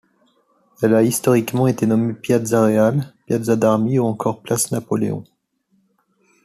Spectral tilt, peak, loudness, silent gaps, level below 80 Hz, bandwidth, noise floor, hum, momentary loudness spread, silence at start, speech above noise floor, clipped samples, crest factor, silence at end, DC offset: -6 dB/octave; -2 dBFS; -18 LUFS; none; -58 dBFS; 14.5 kHz; -65 dBFS; none; 8 LU; 0.8 s; 47 dB; under 0.1%; 16 dB; 1.2 s; under 0.1%